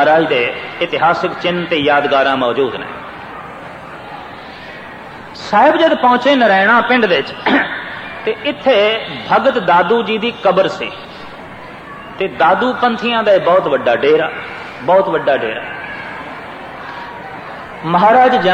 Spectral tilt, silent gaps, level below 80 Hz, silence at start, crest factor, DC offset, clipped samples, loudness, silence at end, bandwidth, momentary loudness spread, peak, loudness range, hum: -5.5 dB/octave; none; -52 dBFS; 0 s; 14 dB; under 0.1%; under 0.1%; -13 LUFS; 0 s; 9.4 kHz; 20 LU; 0 dBFS; 7 LU; none